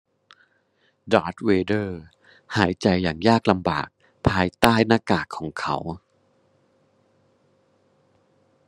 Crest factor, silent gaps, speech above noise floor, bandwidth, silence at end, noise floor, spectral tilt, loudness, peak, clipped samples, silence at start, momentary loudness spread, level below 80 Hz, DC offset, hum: 24 dB; none; 45 dB; 12.5 kHz; 2.7 s; -66 dBFS; -6 dB/octave; -22 LUFS; 0 dBFS; under 0.1%; 1.05 s; 13 LU; -50 dBFS; under 0.1%; none